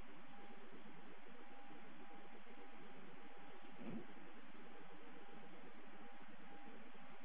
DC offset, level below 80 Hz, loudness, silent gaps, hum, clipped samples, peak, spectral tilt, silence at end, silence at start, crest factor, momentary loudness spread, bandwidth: 0.5%; under -90 dBFS; -60 LUFS; none; none; under 0.1%; -36 dBFS; -4 dB/octave; 0 s; 0 s; 20 dB; 5 LU; 4 kHz